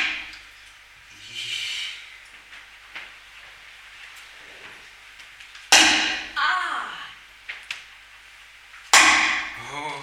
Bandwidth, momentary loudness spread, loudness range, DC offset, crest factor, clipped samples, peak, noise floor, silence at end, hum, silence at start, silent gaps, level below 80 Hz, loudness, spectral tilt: over 20 kHz; 29 LU; 20 LU; under 0.1%; 26 dB; under 0.1%; 0 dBFS; -48 dBFS; 0 s; none; 0 s; none; -58 dBFS; -19 LUFS; 1 dB/octave